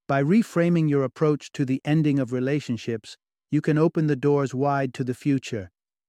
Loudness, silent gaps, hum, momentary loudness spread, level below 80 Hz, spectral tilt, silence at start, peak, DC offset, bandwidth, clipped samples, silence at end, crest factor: -24 LUFS; none; none; 8 LU; -64 dBFS; -7.5 dB/octave; 0.1 s; -8 dBFS; under 0.1%; 11.5 kHz; under 0.1%; 0.4 s; 16 dB